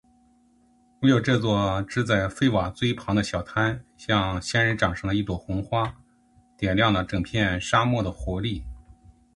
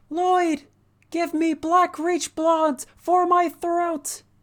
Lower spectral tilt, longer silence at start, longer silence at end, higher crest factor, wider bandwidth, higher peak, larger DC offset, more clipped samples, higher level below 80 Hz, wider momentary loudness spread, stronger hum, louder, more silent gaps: first, -6 dB/octave vs -2.5 dB/octave; first, 1 s vs 0.1 s; first, 0.45 s vs 0.25 s; about the same, 20 dB vs 16 dB; second, 11.5 kHz vs over 20 kHz; first, -4 dBFS vs -8 dBFS; neither; neither; first, -42 dBFS vs -64 dBFS; about the same, 8 LU vs 10 LU; neither; about the same, -24 LUFS vs -22 LUFS; neither